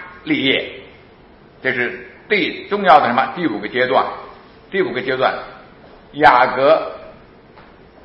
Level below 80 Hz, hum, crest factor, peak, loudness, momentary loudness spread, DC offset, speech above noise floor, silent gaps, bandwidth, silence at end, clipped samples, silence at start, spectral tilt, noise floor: -52 dBFS; none; 18 dB; 0 dBFS; -16 LUFS; 20 LU; under 0.1%; 29 dB; none; 7.4 kHz; 0.95 s; under 0.1%; 0 s; -6.5 dB/octave; -45 dBFS